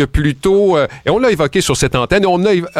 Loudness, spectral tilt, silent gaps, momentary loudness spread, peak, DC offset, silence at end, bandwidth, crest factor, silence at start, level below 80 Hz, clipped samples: -13 LUFS; -5 dB/octave; none; 3 LU; -2 dBFS; under 0.1%; 0 s; 15 kHz; 10 dB; 0 s; -30 dBFS; under 0.1%